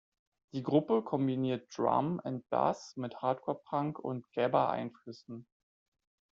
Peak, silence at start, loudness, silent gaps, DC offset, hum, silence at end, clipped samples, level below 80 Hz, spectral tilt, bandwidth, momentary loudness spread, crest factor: -14 dBFS; 0.55 s; -34 LUFS; none; under 0.1%; none; 0.95 s; under 0.1%; -76 dBFS; -6.5 dB/octave; 7.6 kHz; 14 LU; 20 dB